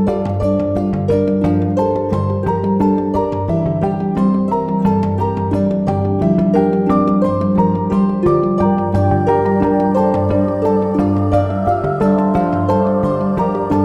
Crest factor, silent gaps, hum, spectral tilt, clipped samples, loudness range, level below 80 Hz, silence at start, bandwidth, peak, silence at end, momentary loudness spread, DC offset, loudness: 14 dB; none; none; -10 dB/octave; under 0.1%; 2 LU; -36 dBFS; 0 s; 6 kHz; -2 dBFS; 0 s; 3 LU; under 0.1%; -16 LUFS